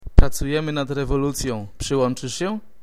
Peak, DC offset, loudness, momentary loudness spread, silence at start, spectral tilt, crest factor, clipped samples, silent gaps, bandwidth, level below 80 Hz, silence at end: 0 dBFS; 1%; -23 LUFS; 7 LU; 0 s; -5.5 dB/octave; 20 dB; under 0.1%; none; 14.5 kHz; -22 dBFS; 0.2 s